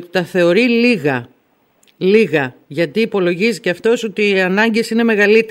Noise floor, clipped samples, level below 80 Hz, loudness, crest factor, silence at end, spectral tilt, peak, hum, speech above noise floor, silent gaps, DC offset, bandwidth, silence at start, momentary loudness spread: -58 dBFS; under 0.1%; -64 dBFS; -15 LUFS; 14 dB; 0 s; -5.5 dB/octave; 0 dBFS; none; 44 dB; none; under 0.1%; 16 kHz; 0 s; 7 LU